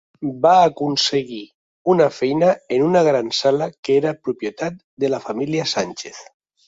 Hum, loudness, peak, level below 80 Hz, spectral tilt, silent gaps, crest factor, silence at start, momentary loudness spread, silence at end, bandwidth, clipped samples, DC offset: none; -19 LUFS; -2 dBFS; -62 dBFS; -5 dB/octave; 1.54-1.85 s, 3.78-3.83 s, 4.84-4.97 s; 18 dB; 0.2 s; 13 LU; 0.45 s; 7.8 kHz; under 0.1%; under 0.1%